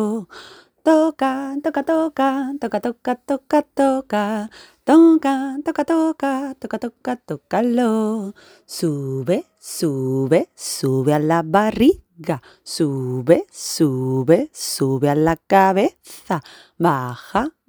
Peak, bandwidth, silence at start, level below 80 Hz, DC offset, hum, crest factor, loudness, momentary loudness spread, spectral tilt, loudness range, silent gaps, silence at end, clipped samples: 0 dBFS; over 20 kHz; 0 s; -54 dBFS; under 0.1%; none; 20 dB; -19 LUFS; 11 LU; -6 dB/octave; 4 LU; none; 0.2 s; under 0.1%